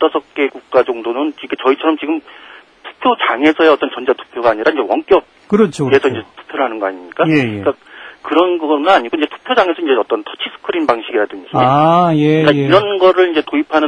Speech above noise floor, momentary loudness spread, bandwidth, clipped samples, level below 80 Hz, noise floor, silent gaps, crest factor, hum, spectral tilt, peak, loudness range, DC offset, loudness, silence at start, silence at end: 23 dB; 9 LU; 10 kHz; under 0.1%; -54 dBFS; -36 dBFS; none; 14 dB; none; -6.5 dB/octave; 0 dBFS; 3 LU; under 0.1%; -14 LUFS; 0 s; 0 s